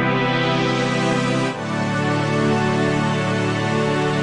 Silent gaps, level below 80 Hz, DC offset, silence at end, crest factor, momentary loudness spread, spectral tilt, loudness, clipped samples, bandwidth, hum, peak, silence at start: none; -52 dBFS; 0.4%; 0 s; 14 dB; 3 LU; -6 dB/octave; -20 LUFS; under 0.1%; 11 kHz; none; -6 dBFS; 0 s